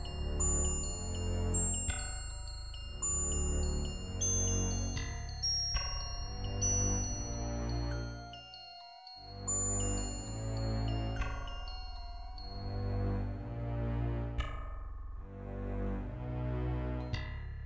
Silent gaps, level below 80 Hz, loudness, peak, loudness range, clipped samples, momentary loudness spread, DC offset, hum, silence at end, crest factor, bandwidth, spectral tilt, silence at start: none; -40 dBFS; -36 LUFS; -20 dBFS; 6 LU; under 0.1%; 16 LU; under 0.1%; none; 0 s; 16 dB; 8 kHz; -3.5 dB/octave; 0 s